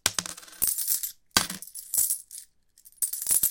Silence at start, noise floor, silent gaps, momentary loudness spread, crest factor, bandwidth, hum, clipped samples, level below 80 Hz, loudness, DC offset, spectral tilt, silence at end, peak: 0.05 s; -58 dBFS; none; 14 LU; 28 dB; 17.5 kHz; none; under 0.1%; -58 dBFS; -26 LUFS; under 0.1%; 0.5 dB/octave; 0 s; -2 dBFS